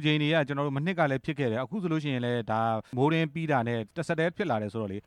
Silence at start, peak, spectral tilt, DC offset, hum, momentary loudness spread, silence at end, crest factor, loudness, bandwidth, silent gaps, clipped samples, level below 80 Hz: 0 s; -12 dBFS; -7 dB/octave; under 0.1%; none; 5 LU; 0.05 s; 16 dB; -29 LUFS; 10.5 kHz; none; under 0.1%; -66 dBFS